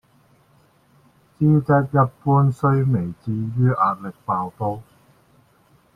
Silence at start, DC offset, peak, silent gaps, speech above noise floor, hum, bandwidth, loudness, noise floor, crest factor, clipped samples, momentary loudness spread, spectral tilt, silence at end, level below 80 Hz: 1.4 s; under 0.1%; -4 dBFS; none; 38 dB; none; 4.2 kHz; -20 LUFS; -57 dBFS; 18 dB; under 0.1%; 10 LU; -10.5 dB/octave; 1.15 s; -54 dBFS